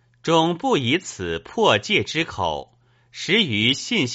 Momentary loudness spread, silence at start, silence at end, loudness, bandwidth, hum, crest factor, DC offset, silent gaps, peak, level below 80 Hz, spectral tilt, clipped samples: 10 LU; 0.25 s; 0 s; -20 LUFS; 8 kHz; none; 20 dB; under 0.1%; none; -2 dBFS; -54 dBFS; -2.5 dB/octave; under 0.1%